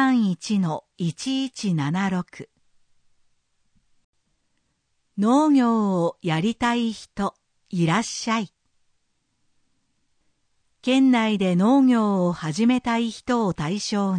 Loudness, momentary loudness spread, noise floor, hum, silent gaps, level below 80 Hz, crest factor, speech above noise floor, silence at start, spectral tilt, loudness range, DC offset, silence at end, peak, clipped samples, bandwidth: -22 LUFS; 11 LU; -71 dBFS; none; 4.04-4.13 s; -58 dBFS; 16 dB; 50 dB; 0 s; -6 dB/octave; 9 LU; under 0.1%; 0 s; -8 dBFS; under 0.1%; 9.8 kHz